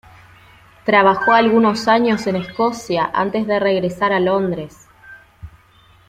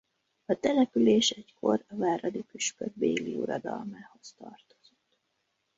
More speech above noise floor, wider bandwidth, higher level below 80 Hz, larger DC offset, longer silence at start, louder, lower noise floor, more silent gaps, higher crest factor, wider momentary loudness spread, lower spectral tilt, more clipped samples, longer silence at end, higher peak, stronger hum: second, 34 dB vs 49 dB; first, 14.5 kHz vs 8 kHz; first, -52 dBFS vs -70 dBFS; neither; first, 0.85 s vs 0.5 s; first, -16 LUFS vs -29 LUFS; second, -50 dBFS vs -78 dBFS; neither; about the same, 16 dB vs 18 dB; second, 9 LU vs 23 LU; first, -5.5 dB/octave vs -4 dB/octave; neither; second, 0.6 s vs 1.2 s; first, -2 dBFS vs -12 dBFS; neither